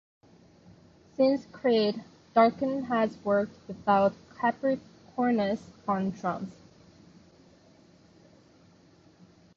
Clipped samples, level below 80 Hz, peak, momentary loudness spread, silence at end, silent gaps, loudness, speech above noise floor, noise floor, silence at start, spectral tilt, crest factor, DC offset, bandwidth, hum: under 0.1%; -66 dBFS; -8 dBFS; 11 LU; 3.05 s; none; -28 LUFS; 32 dB; -59 dBFS; 1.2 s; -7 dB/octave; 22 dB; under 0.1%; 7.4 kHz; none